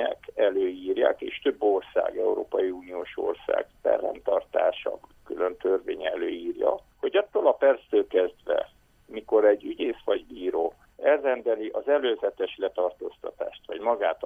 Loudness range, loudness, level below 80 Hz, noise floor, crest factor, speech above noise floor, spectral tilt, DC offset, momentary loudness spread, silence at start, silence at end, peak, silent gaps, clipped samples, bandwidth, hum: 3 LU; -27 LUFS; -62 dBFS; -52 dBFS; 18 dB; 25 dB; -5.5 dB/octave; under 0.1%; 11 LU; 0 s; 0 s; -8 dBFS; none; under 0.1%; 3.7 kHz; none